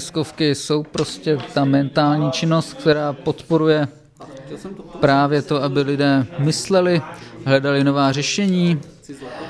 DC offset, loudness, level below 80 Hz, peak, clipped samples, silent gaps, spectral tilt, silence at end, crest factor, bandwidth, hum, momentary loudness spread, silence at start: under 0.1%; -19 LUFS; -54 dBFS; -2 dBFS; under 0.1%; none; -5.5 dB/octave; 0 s; 16 dB; 11 kHz; none; 17 LU; 0 s